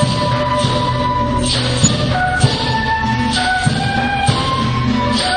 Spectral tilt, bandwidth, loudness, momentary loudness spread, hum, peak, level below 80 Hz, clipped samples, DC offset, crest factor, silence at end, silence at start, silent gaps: -4.5 dB/octave; 10 kHz; -15 LUFS; 3 LU; none; 0 dBFS; -32 dBFS; under 0.1%; under 0.1%; 16 dB; 0 s; 0 s; none